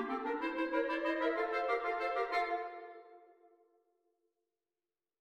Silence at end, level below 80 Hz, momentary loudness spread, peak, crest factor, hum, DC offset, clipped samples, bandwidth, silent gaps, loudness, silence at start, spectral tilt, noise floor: 1.95 s; -74 dBFS; 12 LU; -20 dBFS; 18 dB; none; under 0.1%; under 0.1%; 10.5 kHz; none; -36 LUFS; 0 s; -4 dB/octave; under -90 dBFS